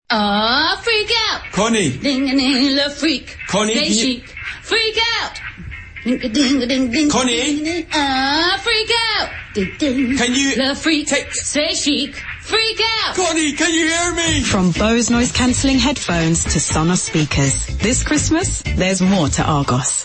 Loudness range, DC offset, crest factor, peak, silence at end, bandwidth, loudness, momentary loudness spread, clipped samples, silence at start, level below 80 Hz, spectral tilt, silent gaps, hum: 2 LU; under 0.1%; 14 dB; -4 dBFS; 0 s; 8.8 kHz; -16 LUFS; 6 LU; under 0.1%; 0.1 s; -34 dBFS; -3.5 dB/octave; none; none